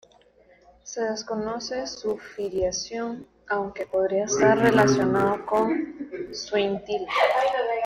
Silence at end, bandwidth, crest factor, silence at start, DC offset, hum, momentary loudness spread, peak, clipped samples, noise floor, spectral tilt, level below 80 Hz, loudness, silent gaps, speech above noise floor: 0 s; 15.5 kHz; 18 dB; 0.85 s; under 0.1%; none; 13 LU; -6 dBFS; under 0.1%; -57 dBFS; -4.5 dB/octave; -56 dBFS; -25 LUFS; none; 33 dB